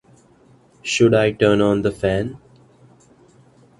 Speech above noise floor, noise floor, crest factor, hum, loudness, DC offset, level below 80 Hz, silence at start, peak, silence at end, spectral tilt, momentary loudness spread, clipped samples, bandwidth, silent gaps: 35 dB; -52 dBFS; 18 dB; none; -18 LUFS; under 0.1%; -46 dBFS; 0.85 s; -2 dBFS; 1.45 s; -5.5 dB/octave; 11 LU; under 0.1%; 11.5 kHz; none